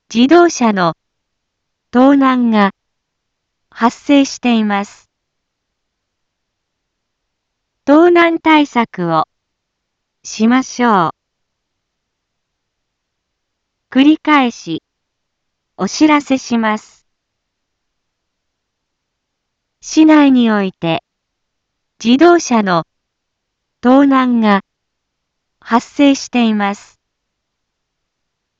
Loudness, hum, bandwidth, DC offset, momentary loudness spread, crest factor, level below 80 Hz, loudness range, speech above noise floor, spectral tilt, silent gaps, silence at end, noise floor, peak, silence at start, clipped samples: -12 LUFS; none; 7.8 kHz; under 0.1%; 11 LU; 14 dB; -60 dBFS; 6 LU; 62 dB; -5 dB/octave; none; 1.85 s; -74 dBFS; 0 dBFS; 0.1 s; under 0.1%